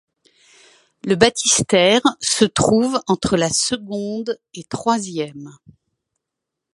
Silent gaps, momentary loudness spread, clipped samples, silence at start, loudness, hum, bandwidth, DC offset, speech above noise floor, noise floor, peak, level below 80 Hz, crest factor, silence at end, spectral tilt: none; 15 LU; under 0.1%; 1.05 s; -17 LUFS; none; 11.5 kHz; under 0.1%; 64 dB; -82 dBFS; 0 dBFS; -50 dBFS; 20 dB; 1.25 s; -3 dB/octave